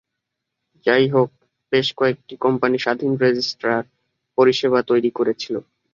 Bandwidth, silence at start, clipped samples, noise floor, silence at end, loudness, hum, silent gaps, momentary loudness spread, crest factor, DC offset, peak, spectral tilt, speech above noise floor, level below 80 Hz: 7.4 kHz; 0.85 s; under 0.1%; -80 dBFS; 0.35 s; -20 LUFS; none; none; 9 LU; 18 dB; under 0.1%; -2 dBFS; -6 dB/octave; 62 dB; -64 dBFS